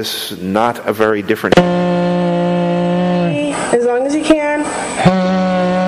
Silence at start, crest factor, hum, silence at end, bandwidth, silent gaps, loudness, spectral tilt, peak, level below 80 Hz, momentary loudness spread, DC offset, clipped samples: 0 s; 14 dB; none; 0 s; 15.5 kHz; none; -14 LUFS; -6 dB/octave; 0 dBFS; -44 dBFS; 5 LU; under 0.1%; under 0.1%